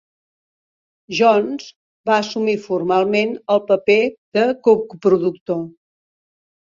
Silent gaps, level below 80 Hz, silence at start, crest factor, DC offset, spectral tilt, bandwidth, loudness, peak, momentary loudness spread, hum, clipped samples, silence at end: 1.76-2.04 s, 4.18-4.32 s, 5.41-5.46 s; -64 dBFS; 1.1 s; 16 dB; under 0.1%; -5.5 dB/octave; 7.4 kHz; -18 LUFS; -2 dBFS; 11 LU; none; under 0.1%; 1.05 s